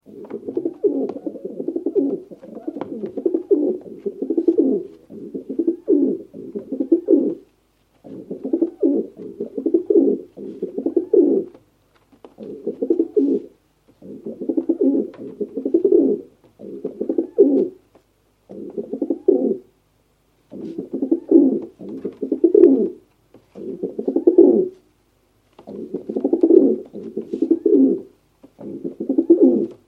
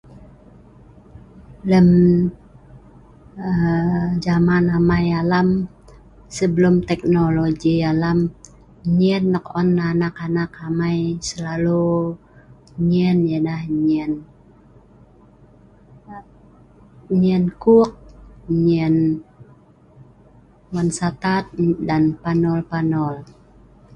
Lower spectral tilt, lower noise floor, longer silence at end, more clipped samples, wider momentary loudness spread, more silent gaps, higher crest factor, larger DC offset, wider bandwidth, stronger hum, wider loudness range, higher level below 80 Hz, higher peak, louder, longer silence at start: first, -10.5 dB/octave vs -7.5 dB/octave; first, -62 dBFS vs -49 dBFS; second, 0.15 s vs 0.7 s; neither; first, 19 LU vs 12 LU; neither; about the same, 20 dB vs 16 dB; neither; second, 2.4 kHz vs 9.4 kHz; neither; about the same, 5 LU vs 5 LU; second, -68 dBFS vs -44 dBFS; about the same, 0 dBFS vs -2 dBFS; about the same, -19 LUFS vs -19 LUFS; about the same, 0.1 s vs 0.1 s